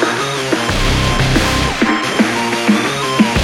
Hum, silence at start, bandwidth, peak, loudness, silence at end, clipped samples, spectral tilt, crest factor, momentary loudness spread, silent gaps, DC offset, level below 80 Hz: none; 0 s; 16.5 kHz; 0 dBFS; -14 LUFS; 0 s; under 0.1%; -4.5 dB/octave; 14 dB; 2 LU; none; under 0.1%; -24 dBFS